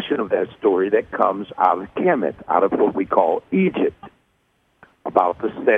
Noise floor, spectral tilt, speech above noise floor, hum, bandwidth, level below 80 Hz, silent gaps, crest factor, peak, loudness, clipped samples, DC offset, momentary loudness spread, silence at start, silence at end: -65 dBFS; -9 dB/octave; 45 dB; none; 3.9 kHz; -58 dBFS; none; 18 dB; -2 dBFS; -20 LUFS; under 0.1%; under 0.1%; 4 LU; 0 s; 0 s